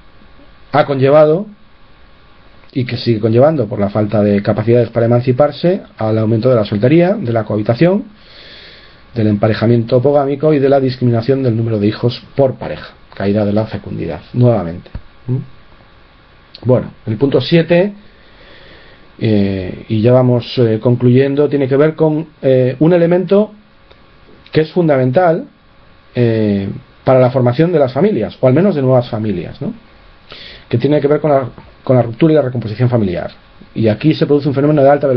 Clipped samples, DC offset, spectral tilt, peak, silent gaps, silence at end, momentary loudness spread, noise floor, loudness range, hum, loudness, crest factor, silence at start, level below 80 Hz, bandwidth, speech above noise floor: under 0.1%; under 0.1%; -10.5 dB/octave; 0 dBFS; none; 0 s; 12 LU; -44 dBFS; 4 LU; none; -13 LUFS; 14 dB; 0.75 s; -46 dBFS; 5.6 kHz; 32 dB